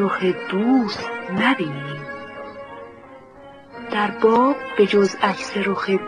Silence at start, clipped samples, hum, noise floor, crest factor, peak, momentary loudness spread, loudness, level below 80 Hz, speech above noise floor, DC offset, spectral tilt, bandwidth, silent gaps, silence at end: 0 s; under 0.1%; none; -43 dBFS; 18 dB; -4 dBFS; 20 LU; -20 LUFS; -60 dBFS; 23 dB; under 0.1%; -6 dB/octave; 10 kHz; none; 0 s